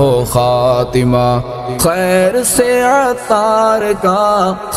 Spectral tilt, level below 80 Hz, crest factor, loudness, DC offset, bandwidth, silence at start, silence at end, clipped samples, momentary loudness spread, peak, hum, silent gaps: -5 dB/octave; -36 dBFS; 12 dB; -12 LUFS; under 0.1%; 16 kHz; 0 s; 0 s; under 0.1%; 3 LU; 0 dBFS; none; none